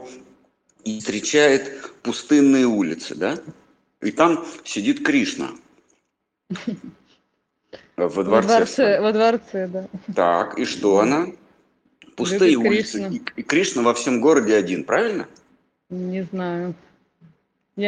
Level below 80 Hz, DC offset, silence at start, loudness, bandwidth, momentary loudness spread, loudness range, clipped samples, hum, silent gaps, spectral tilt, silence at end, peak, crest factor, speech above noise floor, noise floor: -64 dBFS; under 0.1%; 0 s; -20 LUFS; 10 kHz; 15 LU; 7 LU; under 0.1%; none; none; -4.5 dB/octave; 0 s; -2 dBFS; 20 dB; 56 dB; -76 dBFS